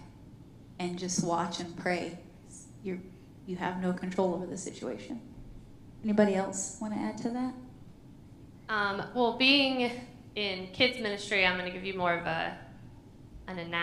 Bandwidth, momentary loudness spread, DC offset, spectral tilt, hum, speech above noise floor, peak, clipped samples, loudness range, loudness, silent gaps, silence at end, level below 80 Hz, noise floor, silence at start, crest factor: 13 kHz; 23 LU; under 0.1%; -4 dB/octave; none; 21 dB; -10 dBFS; under 0.1%; 8 LU; -31 LUFS; none; 0 s; -58 dBFS; -52 dBFS; 0 s; 22 dB